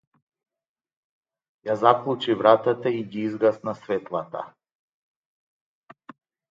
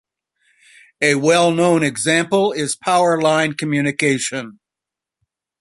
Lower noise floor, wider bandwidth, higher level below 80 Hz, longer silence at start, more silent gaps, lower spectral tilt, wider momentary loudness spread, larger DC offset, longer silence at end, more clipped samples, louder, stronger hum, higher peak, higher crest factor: first, under -90 dBFS vs -86 dBFS; second, 7.6 kHz vs 11.5 kHz; second, -72 dBFS vs -62 dBFS; first, 1.65 s vs 1 s; neither; first, -7 dB/octave vs -4 dB/octave; first, 16 LU vs 7 LU; neither; first, 2.05 s vs 1.1 s; neither; second, -23 LUFS vs -17 LUFS; neither; about the same, -2 dBFS vs -2 dBFS; first, 24 dB vs 16 dB